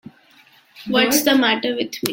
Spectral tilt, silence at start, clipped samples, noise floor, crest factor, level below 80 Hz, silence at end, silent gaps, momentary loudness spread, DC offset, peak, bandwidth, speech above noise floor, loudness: -2.5 dB/octave; 0.75 s; under 0.1%; -52 dBFS; 20 dB; -60 dBFS; 0 s; none; 9 LU; under 0.1%; 0 dBFS; 17 kHz; 34 dB; -17 LUFS